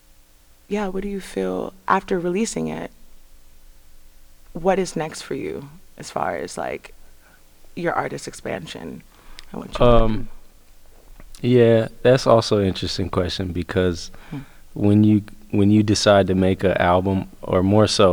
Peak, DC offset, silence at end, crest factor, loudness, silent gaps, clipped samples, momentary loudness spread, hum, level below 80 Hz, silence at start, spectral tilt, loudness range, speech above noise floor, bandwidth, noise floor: -2 dBFS; under 0.1%; 0 s; 20 dB; -20 LUFS; none; under 0.1%; 19 LU; none; -34 dBFS; 0.7 s; -6 dB/octave; 10 LU; 32 dB; 20 kHz; -51 dBFS